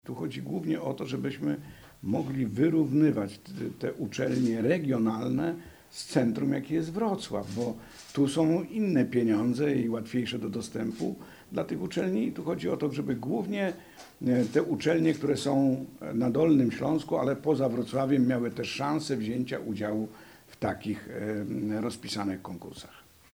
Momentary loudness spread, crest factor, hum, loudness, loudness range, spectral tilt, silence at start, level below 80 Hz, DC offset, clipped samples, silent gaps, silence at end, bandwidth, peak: 10 LU; 18 dB; none; -29 LUFS; 5 LU; -6.5 dB/octave; 0.05 s; -64 dBFS; under 0.1%; under 0.1%; none; 0.3 s; 17 kHz; -12 dBFS